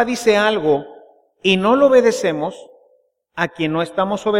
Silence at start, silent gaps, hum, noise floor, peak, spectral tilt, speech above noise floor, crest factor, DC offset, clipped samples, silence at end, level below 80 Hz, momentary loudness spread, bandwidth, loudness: 0 s; none; none; -60 dBFS; -2 dBFS; -5 dB/octave; 43 dB; 16 dB; under 0.1%; under 0.1%; 0 s; -56 dBFS; 11 LU; 15.5 kHz; -17 LUFS